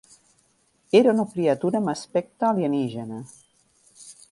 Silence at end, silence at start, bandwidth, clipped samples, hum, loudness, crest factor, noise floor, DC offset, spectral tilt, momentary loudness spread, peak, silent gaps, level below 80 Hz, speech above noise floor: 0.2 s; 0.95 s; 11.5 kHz; under 0.1%; none; -23 LUFS; 22 dB; -65 dBFS; under 0.1%; -6.5 dB/octave; 21 LU; -4 dBFS; none; -68 dBFS; 43 dB